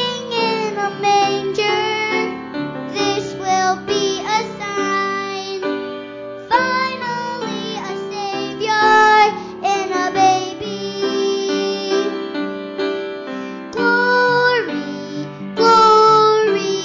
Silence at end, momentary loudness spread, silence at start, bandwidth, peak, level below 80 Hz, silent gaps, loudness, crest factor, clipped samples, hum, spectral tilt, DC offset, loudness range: 0 s; 14 LU; 0 s; 7.6 kHz; -2 dBFS; -58 dBFS; none; -17 LUFS; 14 dB; under 0.1%; none; -3.5 dB/octave; under 0.1%; 6 LU